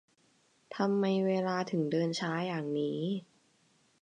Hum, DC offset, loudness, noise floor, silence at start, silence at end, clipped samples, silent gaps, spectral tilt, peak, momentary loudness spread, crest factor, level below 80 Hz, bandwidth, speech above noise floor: none; under 0.1%; -32 LUFS; -69 dBFS; 0.7 s; 0.8 s; under 0.1%; none; -6.5 dB/octave; -16 dBFS; 7 LU; 18 dB; -84 dBFS; 9.8 kHz; 38 dB